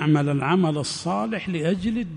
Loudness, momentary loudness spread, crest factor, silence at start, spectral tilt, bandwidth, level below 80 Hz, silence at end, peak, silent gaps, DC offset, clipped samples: -23 LUFS; 5 LU; 14 dB; 0 s; -6 dB/octave; 10.5 kHz; -52 dBFS; 0 s; -8 dBFS; none; under 0.1%; under 0.1%